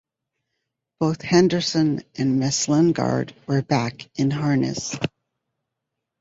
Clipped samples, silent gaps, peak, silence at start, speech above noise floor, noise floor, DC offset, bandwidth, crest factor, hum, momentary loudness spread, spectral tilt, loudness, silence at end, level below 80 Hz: under 0.1%; none; -4 dBFS; 1 s; 61 dB; -82 dBFS; under 0.1%; 8 kHz; 18 dB; none; 8 LU; -5.5 dB/octave; -22 LUFS; 1.15 s; -58 dBFS